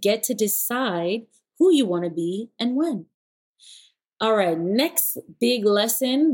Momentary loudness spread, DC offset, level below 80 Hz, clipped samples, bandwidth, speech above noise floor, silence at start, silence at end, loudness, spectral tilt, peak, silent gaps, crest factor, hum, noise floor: 8 LU; under 0.1%; -80 dBFS; under 0.1%; 17 kHz; 31 dB; 0 s; 0 s; -22 LUFS; -3.5 dB/octave; -6 dBFS; 3.14-3.54 s; 16 dB; none; -52 dBFS